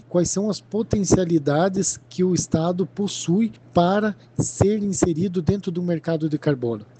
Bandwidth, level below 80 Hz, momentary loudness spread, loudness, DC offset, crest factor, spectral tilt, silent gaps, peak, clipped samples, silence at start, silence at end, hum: 9.2 kHz; -46 dBFS; 6 LU; -22 LUFS; under 0.1%; 18 dB; -5.5 dB/octave; none; -4 dBFS; under 0.1%; 0.1 s; 0.15 s; none